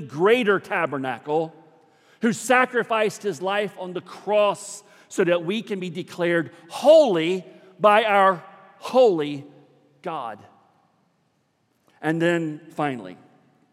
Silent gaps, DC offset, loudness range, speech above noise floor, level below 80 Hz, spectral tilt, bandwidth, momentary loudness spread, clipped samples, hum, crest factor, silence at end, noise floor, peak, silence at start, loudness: none; under 0.1%; 10 LU; 47 dB; -82 dBFS; -5 dB/octave; 14.5 kHz; 17 LU; under 0.1%; none; 20 dB; 0.6 s; -68 dBFS; -4 dBFS; 0 s; -22 LUFS